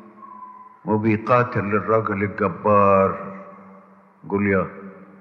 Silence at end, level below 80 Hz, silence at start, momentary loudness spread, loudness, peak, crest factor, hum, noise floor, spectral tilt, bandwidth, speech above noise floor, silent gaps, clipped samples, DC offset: 0.15 s; -64 dBFS; 0.2 s; 23 LU; -20 LUFS; -4 dBFS; 18 dB; none; -49 dBFS; -10 dB/octave; 6.2 kHz; 30 dB; none; under 0.1%; under 0.1%